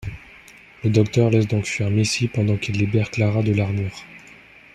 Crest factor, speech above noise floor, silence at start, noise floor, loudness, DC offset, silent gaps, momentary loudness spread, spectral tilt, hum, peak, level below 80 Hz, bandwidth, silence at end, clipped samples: 18 dB; 27 dB; 0 s; -46 dBFS; -21 LUFS; under 0.1%; none; 14 LU; -6 dB/octave; none; -4 dBFS; -50 dBFS; 10 kHz; 0.55 s; under 0.1%